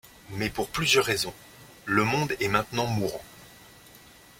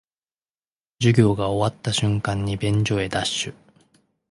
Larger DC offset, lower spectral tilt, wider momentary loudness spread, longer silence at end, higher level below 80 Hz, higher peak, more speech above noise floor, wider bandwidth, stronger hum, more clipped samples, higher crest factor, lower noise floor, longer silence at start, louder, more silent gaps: neither; second, -4 dB/octave vs -5.5 dB/octave; first, 19 LU vs 7 LU; second, 0.4 s vs 0.8 s; second, -54 dBFS vs -46 dBFS; second, -6 dBFS vs -2 dBFS; second, 25 dB vs over 69 dB; first, 16.5 kHz vs 11.5 kHz; neither; neither; about the same, 24 dB vs 20 dB; second, -52 dBFS vs under -90 dBFS; second, 0.3 s vs 1 s; second, -26 LUFS vs -22 LUFS; neither